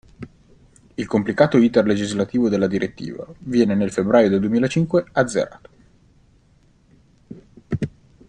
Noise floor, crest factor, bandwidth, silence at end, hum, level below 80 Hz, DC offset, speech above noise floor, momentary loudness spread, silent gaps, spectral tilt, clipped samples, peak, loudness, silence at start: -56 dBFS; 18 dB; 10 kHz; 0.4 s; none; -52 dBFS; under 0.1%; 37 dB; 17 LU; none; -6.5 dB/octave; under 0.1%; -2 dBFS; -20 LUFS; 0.2 s